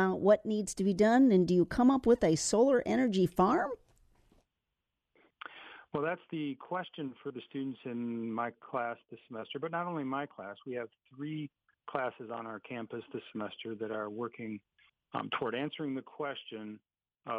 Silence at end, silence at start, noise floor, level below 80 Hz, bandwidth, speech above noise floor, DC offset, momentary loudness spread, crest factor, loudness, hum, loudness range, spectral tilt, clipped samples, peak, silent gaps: 0 s; 0 s; -87 dBFS; -62 dBFS; 13.5 kHz; 54 dB; under 0.1%; 19 LU; 20 dB; -33 LUFS; none; 14 LU; -5.5 dB/octave; under 0.1%; -14 dBFS; none